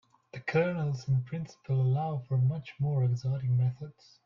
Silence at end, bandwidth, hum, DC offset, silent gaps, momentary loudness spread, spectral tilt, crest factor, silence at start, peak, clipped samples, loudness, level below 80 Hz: 0.35 s; 6.8 kHz; none; under 0.1%; none; 11 LU; -8.5 dB/octave; 14 dB; 0.35 s; -16 dBFS; under 0.1%; -31 LUFS; -64 dBFS